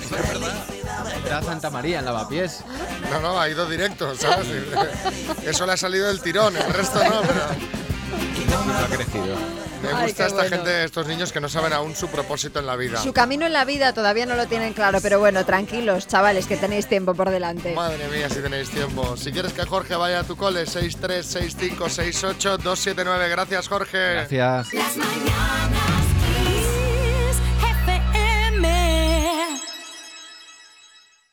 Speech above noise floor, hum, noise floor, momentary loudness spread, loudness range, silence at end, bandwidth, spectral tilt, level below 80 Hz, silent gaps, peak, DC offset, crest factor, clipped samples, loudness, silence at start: 30 dB; none; -52 dBFS; 8 LU; 4 LU; 0.7 s; 19 kHz; -4 dB/octave; -30 dBFS; none; -2 dBFS; under 0.1%; 20 dB; under 0.1%; -22 LUFS; 0 s